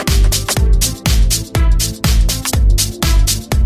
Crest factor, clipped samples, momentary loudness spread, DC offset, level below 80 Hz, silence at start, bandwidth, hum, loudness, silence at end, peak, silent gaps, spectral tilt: 12 dB; under 0.1%; 2 LU; under 0.1%; -14 dBFS; 0 s; 16 kHz; none; -14 LUFS; 0 s; 0 dBFS; none; -3.5 dB/octave